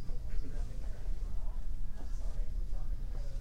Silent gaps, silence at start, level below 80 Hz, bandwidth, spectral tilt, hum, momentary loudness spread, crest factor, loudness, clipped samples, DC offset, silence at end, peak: none; 0 s; -36 dBFS; 6.2 kHz; -6.5 dB/octave; none; 2 LU; 12 dB; -44 LUFS; under 0.1%; under 0.1%; 0 s; -20 dBFS